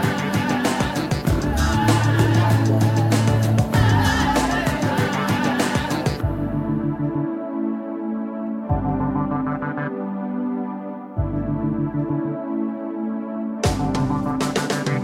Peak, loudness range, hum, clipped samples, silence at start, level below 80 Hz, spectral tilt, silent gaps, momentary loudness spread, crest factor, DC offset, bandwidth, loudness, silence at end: -4 dBFS; 7 LU; none; under 0.1%; 0 s; -34 dBFS; -6 dB/octave; none; 9 LU; 16 dB; under 0.1%; 16 kHz; -22 LUFS; 0 s